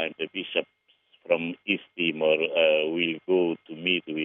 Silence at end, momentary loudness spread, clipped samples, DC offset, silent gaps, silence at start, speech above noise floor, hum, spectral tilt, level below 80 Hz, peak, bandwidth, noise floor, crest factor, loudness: 0 s; 8 LU; under 0.1%; under 0.1%; none; 0 s; 33 dB; none; -7 dB/octave; -82 dBFS; -8 dBFS; 3.8 kHz; -58 dBFS; 18 dB; -26 LUFS